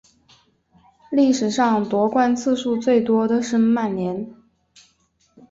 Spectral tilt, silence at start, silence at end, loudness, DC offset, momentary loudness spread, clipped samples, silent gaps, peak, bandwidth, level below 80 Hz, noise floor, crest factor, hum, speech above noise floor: -5.5 dB/octave; 1.1 s; 1.15 s; -20 LUFS; under 0.1%; 7 LU; under 0.1%; none; -6 dBFS; 8 kHz; -60 dBFS; -63 dBFS; 16 dB; none; 45 dB